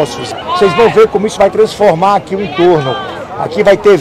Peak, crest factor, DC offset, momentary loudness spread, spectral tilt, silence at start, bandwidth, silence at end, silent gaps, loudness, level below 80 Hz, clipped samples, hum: 0 dBFS; 10 dB; under 0.1%; 11 LU; -5.5 dB/octave; 0 s; 13 kHz; 0 s; none; -10 LUFS; -42 dBFS; under 0.1%; none